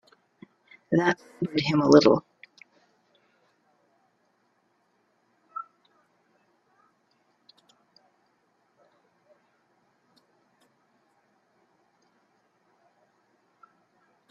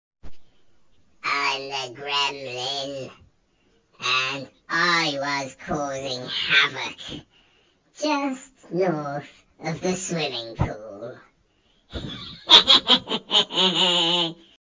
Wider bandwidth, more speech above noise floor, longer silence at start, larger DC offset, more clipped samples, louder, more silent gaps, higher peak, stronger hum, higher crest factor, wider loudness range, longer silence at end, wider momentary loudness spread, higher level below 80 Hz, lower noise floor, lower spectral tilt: about the same, 7.4 kHz vs 7.8 kHz; first, 49 dB vs 41 dB; first, 0.9 s vs 0.25 s; neither; neither; about the same, -23 LUFS vs -21 LUFS; neither; second, -4 dBFS vs 0 dBFS; neither; about the same, 28 dB vs 24 dB; first, 25 LU vs 11 LU; first, 8.7 s vs 0.35 s; first, 23 LU vs 19 LU; second, -70 dBFS vs -50 dBFS; first, -70 dBFS vs -64 dBFS; first, -6 dB/octave vs -2.5 dB/octave